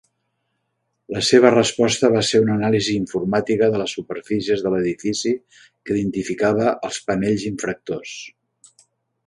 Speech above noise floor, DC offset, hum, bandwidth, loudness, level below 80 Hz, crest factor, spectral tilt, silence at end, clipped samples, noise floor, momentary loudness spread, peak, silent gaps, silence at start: 54 dB; under 0.1%; none; 11.5 kHz; -20 LUFS; -54 dBFS; 20 dB; -4.5 dB/octave; 0.95 s; under 0.1%; -74 dBFS; 13 LU; 0 dBFS; none; 1.1 s